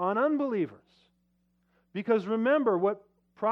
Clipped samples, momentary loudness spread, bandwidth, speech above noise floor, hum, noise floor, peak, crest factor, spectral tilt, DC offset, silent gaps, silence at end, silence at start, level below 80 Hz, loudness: under 0.1%; 12 LU; 6.4 kHz; 45 dB; 60 Hz at -65 dBFS; -72 dBFS; -14 dBFS; 16 dB; -8.5 dB/octave; under 0.1%; none; 0 s; 0 s; -80 dBFS; -28 LUFS